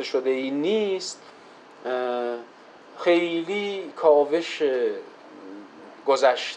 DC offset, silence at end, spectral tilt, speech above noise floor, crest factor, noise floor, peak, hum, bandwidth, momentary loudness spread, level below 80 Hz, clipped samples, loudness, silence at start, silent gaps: under 0.1%; 0 s; -4 dB/octave; 20 dB; 18 dB; -44 dBFS; -6 dBFS; none; 9.8 kHz; 22 LU; -82 dBFS; under 0.1%; -24 LUFS; 0 s; none